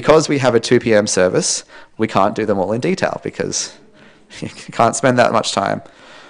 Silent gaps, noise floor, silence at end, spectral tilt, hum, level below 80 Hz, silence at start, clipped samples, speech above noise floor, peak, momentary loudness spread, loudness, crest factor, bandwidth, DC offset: none; -46 dBFS; 0.1 s; -4 dB/octave; none; -50 dBFS; 0 s; under 0.1%; 30 dB; 0 dBFS; 13 LU; -16 LUFS; 16 dB; 10.5 kHz; under 0.1%